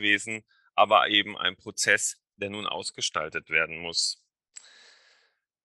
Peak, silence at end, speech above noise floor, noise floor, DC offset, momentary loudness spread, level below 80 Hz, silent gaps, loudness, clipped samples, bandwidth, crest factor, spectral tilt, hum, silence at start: -6 dBFS; 1.5 s; 43 dB; -69 dBFS; under 0.1%; 14 LU; -70 dBFS; none; -26 LUFS; under 0.1%; 12.5 kHz; 22 dB; -1 dB/octave; none; 0 s